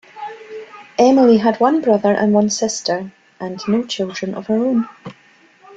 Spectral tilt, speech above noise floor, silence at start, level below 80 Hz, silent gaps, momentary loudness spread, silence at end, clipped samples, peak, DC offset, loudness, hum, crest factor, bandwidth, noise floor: -5 dB/octave; 33 dB; 0.15 s; -60 dBFS; none; 22 LU; 0 s; under 0.1%; -2 dBFS; under 0.1%; -16 LUFS; none; 16 dB; 8 kHz; -48 dBFS